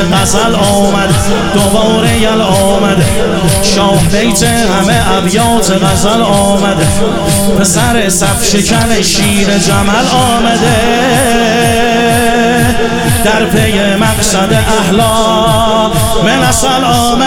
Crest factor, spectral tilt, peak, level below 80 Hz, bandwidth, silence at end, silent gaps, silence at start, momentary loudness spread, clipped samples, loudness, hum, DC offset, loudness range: 8 dB; -4 dB/octave; 0 dBFS; -24 dBFS; 17 kHz; 0 s; none; 0 s; 2 LU; under 0.1%; -9 LUFS; none; 2%; 1 LU